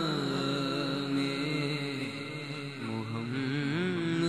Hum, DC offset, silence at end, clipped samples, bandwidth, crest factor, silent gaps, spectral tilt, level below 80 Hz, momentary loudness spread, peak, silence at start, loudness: none; under 0.1%; 0 s; under 0.1%; 13 kHz; 14 dB; none; -6 dB/octave; -72 dBFS; 7 LU; -18 dBFS; 0 s; -33 LUFS